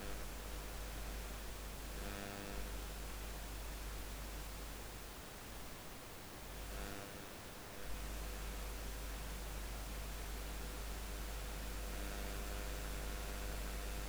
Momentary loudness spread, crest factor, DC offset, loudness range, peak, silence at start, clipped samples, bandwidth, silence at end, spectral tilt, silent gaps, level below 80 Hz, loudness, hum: 5 LU; 18 dB; under 0.1%; 3 LU; -28 dBFS; 0 s; under 0.1%; over 20 kHz; 0 s; -3.5 dB/octave; none; -48 dBFS; -47 LUFS; none